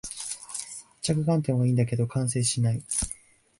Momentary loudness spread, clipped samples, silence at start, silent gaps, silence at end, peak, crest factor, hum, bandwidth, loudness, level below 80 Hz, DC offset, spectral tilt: 11 LU; under 0.1%; 0.05 s; none; 0.45 s; -12 dBFS; 16 dB; none; 11.5 kHz; -27 LUFS; -50 dBFS; under 0.1%; -5.5 dB/octave